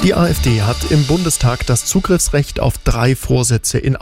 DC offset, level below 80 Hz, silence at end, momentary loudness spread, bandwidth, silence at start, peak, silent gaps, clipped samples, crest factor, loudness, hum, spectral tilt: 0.4%; -26 dBFS; 0 s; 3 LU; 16.5 kHz; 0 s; -4 dBFS; none; under 0.1%; 10 dB; -15 LUFS; none; -5 dB/octave